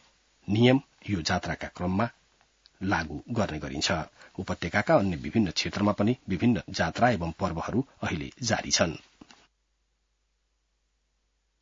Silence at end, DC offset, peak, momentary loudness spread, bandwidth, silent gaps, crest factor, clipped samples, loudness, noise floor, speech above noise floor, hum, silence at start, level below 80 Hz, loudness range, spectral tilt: 2.6 s; under 0.1%; -6 dBFS; 10 LU; 7.8 kHz; none; 24 dB; under 0.1%; -28 LUFS; -74 dBFS; 47 dB; none; 0.5 s; -54 dBFS; 5 LU; -5 dB/octave